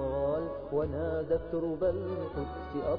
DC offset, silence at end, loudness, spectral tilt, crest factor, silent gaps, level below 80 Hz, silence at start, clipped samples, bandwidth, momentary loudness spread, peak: under 0.1%; 0 s; -33 LUFS; -7.5 dB/octave; 14 dB; none; -48 dBFS; 0 s; under 0.1%; 5.2 kHz; 5 LU; -18 dBFS